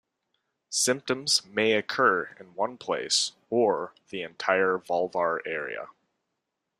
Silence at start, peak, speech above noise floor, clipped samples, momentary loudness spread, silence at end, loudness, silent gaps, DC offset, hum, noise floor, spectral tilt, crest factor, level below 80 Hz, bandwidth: 0.7 s; -8 dBFS; 55 dB; under 0.1%; 13 LU; 0.9 s; -26 LUFS; none; under 0.1%; none; -82 dBFS; -2 dB/octave; 22 dB; -74 dBFS; 15.5 kHz